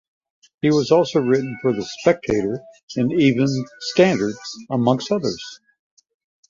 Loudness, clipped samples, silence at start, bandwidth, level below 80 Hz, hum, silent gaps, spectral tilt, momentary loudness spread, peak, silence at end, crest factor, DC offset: -20 LUFS; under 0.1%; 0.65 s; 7.6 kHz; -54 dBFS; none; 2.83-2.88 s; -6 dB/octave; 10 LU; -2 dBFS; 0.95 s; 18 dB; under 0.1%